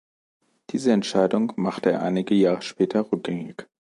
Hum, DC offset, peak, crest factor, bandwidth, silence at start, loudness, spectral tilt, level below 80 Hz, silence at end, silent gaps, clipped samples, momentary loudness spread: none; under 0.1%; -6 dBFS; 18 dB; 11.5 kHz; 0.7 s; -23 LUFS; -6.5 dB/octave; -68 dBFS; 0.35 s; none; under 0.1%; 11 LU